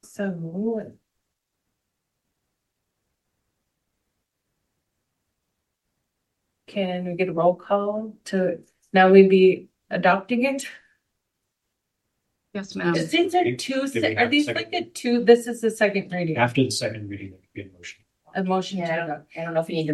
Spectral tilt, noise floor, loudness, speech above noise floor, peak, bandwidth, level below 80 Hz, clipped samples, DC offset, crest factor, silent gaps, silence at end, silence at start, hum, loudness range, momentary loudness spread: -5.5 dB/octave; -80 dBFS; -22 LUFS; 58 dB; -2 dBFS; 12.5 kHz; -70 dBFS; under 0.1%; under 0.1%; 22 dB; none; 0 s; 0.2 s; none; 13 LU; 18 LU